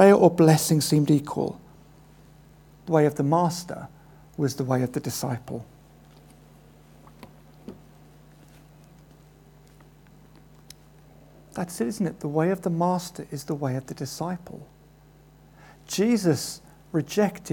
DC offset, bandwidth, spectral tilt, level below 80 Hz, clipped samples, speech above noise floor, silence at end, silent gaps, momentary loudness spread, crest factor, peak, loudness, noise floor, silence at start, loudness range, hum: under 0.1%; 19 kHz; -6 dB/octave; -58 dBFS; under 0.1%; 30 dB; 0 s; none; 21 LU; 24 dB; -2 dBFS; -25 LUFS; -53 dBFS; 0 s; 11 LU; none